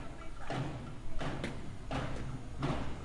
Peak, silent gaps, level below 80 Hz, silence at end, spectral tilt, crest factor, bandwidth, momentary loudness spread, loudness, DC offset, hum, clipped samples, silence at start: -22 dBFS; none; -46 dBFS; 0 s; -6 dB/octave; 14 dB; 11.5 kHz; 9 LU; -41 LUFS; under 0.1%; none; under 0.1%; 0 s